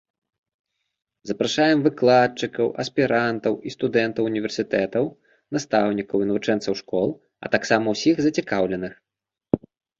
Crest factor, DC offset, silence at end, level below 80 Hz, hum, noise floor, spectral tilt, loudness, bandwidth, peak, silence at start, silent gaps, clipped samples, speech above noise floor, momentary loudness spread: 20 dB; under 0.1%; 0.45 s; -58 dBFS; none; -86 dBFS; -5.5 dB/octave; -22 LUFS; 7.8 kHz; -2 dBFS; 1.25 s; none; under 0.1%; 64 dB; 9 LU